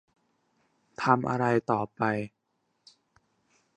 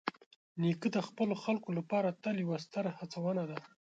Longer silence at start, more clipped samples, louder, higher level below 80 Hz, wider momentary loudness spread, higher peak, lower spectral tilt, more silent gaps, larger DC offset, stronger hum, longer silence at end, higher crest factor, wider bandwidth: first, 1 s vs 0.05 s; neither; first, -28 LUFS vs -36 LUFS; first, -66 dBFS vs -82 dBFS; first, 13 LU vs 8 LU; first, -6 dBFS vs -14 dBFS; about the same, -7.5 dB/octave vs -7 dB/octave; second, none vs 0.26-0.55 s; neither; neither; first, 1.5 s vs 0.3 s; about the same, 24 dB vs 22 dB; first, 9.8 kHz vs 7.8 kHz